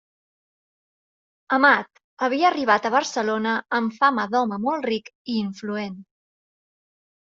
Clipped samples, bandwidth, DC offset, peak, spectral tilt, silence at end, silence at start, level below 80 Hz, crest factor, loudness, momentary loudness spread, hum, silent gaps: under 0.1%; 7.6 kHz; under 0.1%; -4 dBFS; -2 dB/octave; 1.25 s; 1.5 s; -70 dBFS; 22 dB; -22 LUFS; 12 LU; none; 2.04-2.17 s, 5.15-5.25 s